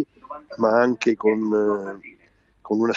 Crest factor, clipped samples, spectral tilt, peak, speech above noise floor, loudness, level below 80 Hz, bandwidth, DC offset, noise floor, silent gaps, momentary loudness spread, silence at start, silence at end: 16 dB; under 0.1%; -6.5 dB/octave; -6 dBFS; 39 dB; -22 LUFS; -66 dBFS; 7.6 kHz; under 0.1%; -60 dBFS; none; 19 LU; 0 s; 0 s